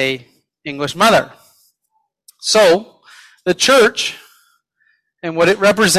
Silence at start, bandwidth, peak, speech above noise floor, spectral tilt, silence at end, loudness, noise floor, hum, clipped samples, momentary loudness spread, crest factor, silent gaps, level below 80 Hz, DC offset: 0 s; 15.5 kHz; 0 dBFS; 54 dB; -3 dB/octave; 0 s; -14 LUFS; -67 dBFS; none; under 0.1%; 18 LU; 16 dB; none; -56 dBFS; under 0.1%